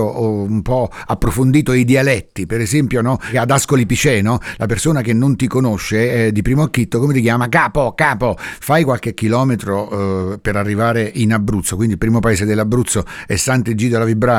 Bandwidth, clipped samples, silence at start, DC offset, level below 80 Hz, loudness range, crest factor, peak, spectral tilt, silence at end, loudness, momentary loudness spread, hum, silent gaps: 17 kHz; under 0.1%; 0 s; under 0.1%; -34 dBFS; 2 LU; 12 dB; -2 dBFS; -5.5 dB/octave; 0 s; -16 LUFS; 6 LU; none; none